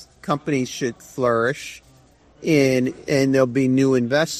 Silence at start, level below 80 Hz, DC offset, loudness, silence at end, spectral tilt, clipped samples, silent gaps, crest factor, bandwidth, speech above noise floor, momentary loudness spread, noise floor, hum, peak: 0 s; -56 dBFS; under 0.1%; -20 LUFS; 0 s; -5.5 dB/octave; under 0.1%; none; 16 dB; 14.5 kHz; 33 dB; 10 LU; -53 dBFS; none; -4 dBFS